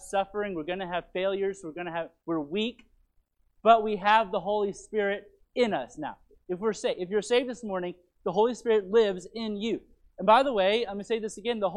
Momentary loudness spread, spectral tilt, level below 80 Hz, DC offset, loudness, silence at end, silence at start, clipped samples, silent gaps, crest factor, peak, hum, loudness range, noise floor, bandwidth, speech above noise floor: 13 LU; -4.5 dB/octave; -62 dBFS; under 0.1%; -28 LUFS; 0 s; 0 s; under 0.1%; none; 22 dB; -6 dBFS; none; 4 LU; -68 dBFS; 11.5 kHz; 41 dB